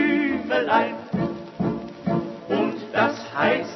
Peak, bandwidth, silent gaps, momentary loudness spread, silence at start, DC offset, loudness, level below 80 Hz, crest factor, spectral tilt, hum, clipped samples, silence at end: -6 dBFS; 6.2 kHz; none; 7 LU; 0 s; under 0.1%; -24 LUFS; -56 dBFS; 16 dB; -7 dB/octave; none; under 0.1%; 0 s